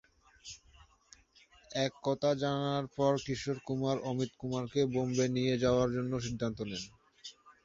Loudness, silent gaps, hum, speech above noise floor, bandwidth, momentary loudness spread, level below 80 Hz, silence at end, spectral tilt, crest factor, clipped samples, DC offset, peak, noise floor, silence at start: -33 LUFS; none; none; 31 dB; 7.8 kHz; 19 LU; -60 dBFS; 0.15 s; -6 dB/octave; 18 dB; under 0.1%; under 0.1%; -16 dBFS; -64 dBFS; 0.45 s